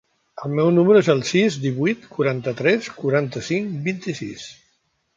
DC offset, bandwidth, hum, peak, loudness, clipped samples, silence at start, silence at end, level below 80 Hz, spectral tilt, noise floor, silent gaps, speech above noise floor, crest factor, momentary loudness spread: under 0.1%; 7.6 kHz; none; -4 dBFS; -20 LUFS; under 0.1%; 0.35 s; 0.65 s; -62 dBFS; -6 dB/octave; -67 dBFS; none; 48 dB; 18 dB; 15 LU